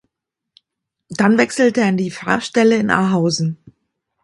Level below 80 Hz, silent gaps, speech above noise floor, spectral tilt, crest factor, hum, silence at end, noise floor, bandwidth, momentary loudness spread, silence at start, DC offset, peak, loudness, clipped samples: -56 dBFS; none; 65 dB; -5.5 dB/octave; 18 dB; none; 0.7 s; -80 dBFS; 11.5 kHz; 8 LU; 1.1 s; under 0.1%; 0 dBFS; -16 LUFS; under 0.1%